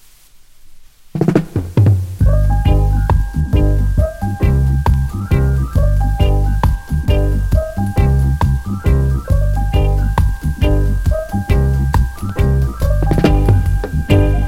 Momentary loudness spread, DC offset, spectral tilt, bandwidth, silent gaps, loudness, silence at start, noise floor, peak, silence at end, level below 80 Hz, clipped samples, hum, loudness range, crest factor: 5 LU; under 0.1%; -8 dB/octave; 15.5 kHz; none; -16 LUFS; 0.65 s; -42 dBFS; 0 dBFS; 0 s; -16 dBFS; under 0.1%; none; 1 LU; 14 dB